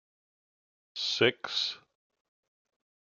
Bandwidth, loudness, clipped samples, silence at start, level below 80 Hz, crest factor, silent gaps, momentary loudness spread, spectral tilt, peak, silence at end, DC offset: 7.4 kHz; -29 LUFS; under 0.1%; 0.95 s; -82 dBFS; 26 dB; none; 17 LU; -3 dB/octave; -10 dBFS; 1.35 s; under 0.1%